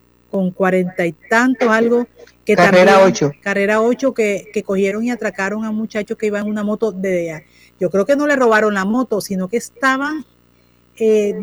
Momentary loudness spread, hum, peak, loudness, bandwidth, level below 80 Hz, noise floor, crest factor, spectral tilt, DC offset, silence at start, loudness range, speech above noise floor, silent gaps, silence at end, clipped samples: 11 LU; 60 Hz at -45 dBFS; 0 dBFS; -16 LUFS; over 20 kHz; -56 dBFS; -54 dBFS; 16 dB; -5.5 dB/octave; under 0.1%; 0.35 s; 6 LU; 38 dB; none; 0 s; under 0.1%